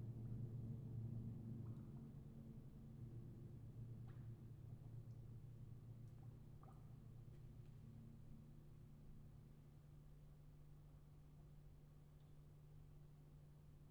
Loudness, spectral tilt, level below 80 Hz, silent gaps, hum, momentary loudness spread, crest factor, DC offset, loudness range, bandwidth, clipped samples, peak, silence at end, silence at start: -59 LUFS; -9 dB/octave; -66 dBFS; none; none; 14 LU; 16 dB; under 0.1%; 11 LU; 19 kHz; under 0.1%; -40 dBFS; 0 s; 0 s